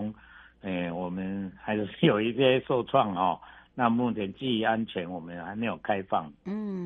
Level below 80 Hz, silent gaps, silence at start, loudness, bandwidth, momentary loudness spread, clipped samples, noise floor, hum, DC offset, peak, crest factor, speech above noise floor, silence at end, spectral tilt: -62 dBFS; none; 0 s; -29 LUFS; 4.2 kHz; 13 LU; under 0.1%; -53 dBFS; none; under 0.1%; -8 dBFS; 20 dB; 25 dB; 0 s; -8.5 dB/octave